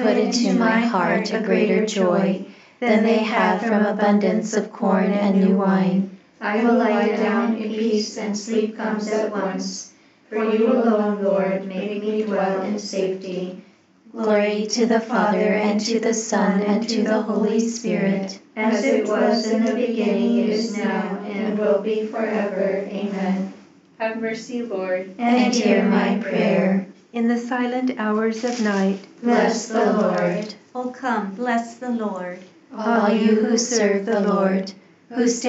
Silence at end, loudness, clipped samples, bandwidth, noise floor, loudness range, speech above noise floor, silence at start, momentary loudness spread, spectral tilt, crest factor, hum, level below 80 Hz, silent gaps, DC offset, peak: 0 s; -21 LUFS; under 0.1%; 8.2 kHz; -51 dBFS; 4 LU; 31 dB; 0 s; 9 LU; -5.5 dB/octave; 16 dB; none; -76 dBFS; none; under 0.1%; -4 dBFS